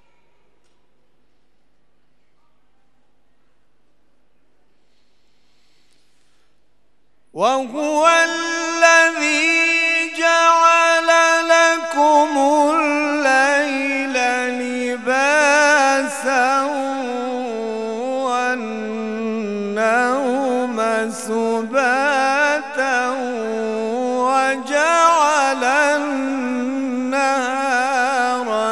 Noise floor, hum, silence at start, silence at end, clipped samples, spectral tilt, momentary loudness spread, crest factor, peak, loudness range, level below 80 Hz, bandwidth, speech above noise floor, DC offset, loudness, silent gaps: -66 dBFS; none; 7.35 s; 0 s; under 0.1%; -2 dB/octave; 10 LU; 18 dB; 0 dBFS; 7 LU; -72 dBFS; 13 kHz; 50 dB; 0.3%; -17 LUFS; none